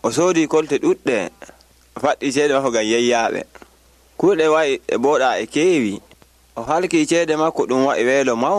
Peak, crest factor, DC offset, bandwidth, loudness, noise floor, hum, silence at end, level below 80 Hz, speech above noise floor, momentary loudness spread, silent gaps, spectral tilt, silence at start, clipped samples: -4 dBFS; 14 dB; under 0.1%; 13.5 kHz; -18 LUFS; -52 dBFS; none; 0 s; -56 dBFS; 35 dB; 7 LU; none; -4 dB/octave; 0.05 s; under 0.1%